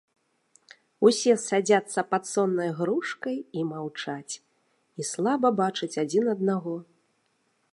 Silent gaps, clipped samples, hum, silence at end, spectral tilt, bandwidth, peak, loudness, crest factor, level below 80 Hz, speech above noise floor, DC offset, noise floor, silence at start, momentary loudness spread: none; under 0.1%; none; 0.9 s; -4.5 dB/octave; 11.5 kHz; -8 dBFS; -26 LUFS; 20 dB; -80 dBFS; 46 dB; under 0.1%; -71 dBFS; 1 s; 12 LU